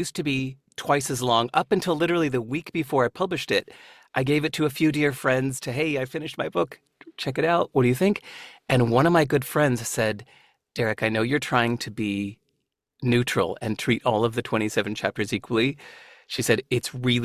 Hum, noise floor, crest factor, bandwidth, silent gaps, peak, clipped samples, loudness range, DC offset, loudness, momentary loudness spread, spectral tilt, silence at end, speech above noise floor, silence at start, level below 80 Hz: none; -77 dBFS; 20 dB; 16 kHz; none; -4 dBFS; under 0.1%; 3 LU; under 0.1%; -24 LUFS; 9 LU; -5 dB/octave; 0 s; 53 dB; 0 s; -56 dBFS